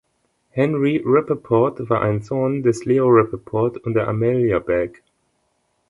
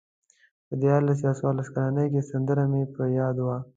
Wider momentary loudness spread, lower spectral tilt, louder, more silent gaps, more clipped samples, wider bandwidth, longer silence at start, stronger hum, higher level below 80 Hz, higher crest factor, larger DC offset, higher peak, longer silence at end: about the same, 6 LU vs 5 LU; second, -8.5 dB/octave vs -10 dB/octave; first, -19 LUFS vs -26 LUFS; neither; neither; first, 11 kHz vs 7.8 kHz; second, 0.55 s vs 0.7 s; neither; first, -50 dBFS vs -62 dBFS; about the same, 18 dB vs 18 dB; neither; first, -2 dBFS vs -8 dBFS; first, 1 s vs 0.15 s